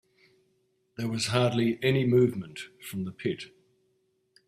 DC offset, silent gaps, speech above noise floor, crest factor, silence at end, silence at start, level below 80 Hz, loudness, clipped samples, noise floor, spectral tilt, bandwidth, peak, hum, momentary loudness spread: under 0.1%; none; 45 dB; 22 dB; 1 s; 1 s; -64 dBFS; -28 LUFS; under 0.1%; -73 dBFS; -6 dB/octave; 14.5 kHz; -8 dBFS; none; 17 LU